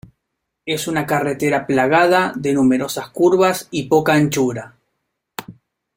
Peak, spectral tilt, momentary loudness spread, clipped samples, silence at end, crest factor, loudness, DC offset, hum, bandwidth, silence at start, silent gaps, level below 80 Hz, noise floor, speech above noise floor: -2 dBFS; -5 dB/octave; 18 LU; under 0.1%; 0.45 s; 16 dB; -17 LUFS; under 0.1%; none; 16.5 kHz; 0.65 s; none; -56 dBFS; -77 dBFS; 60 dB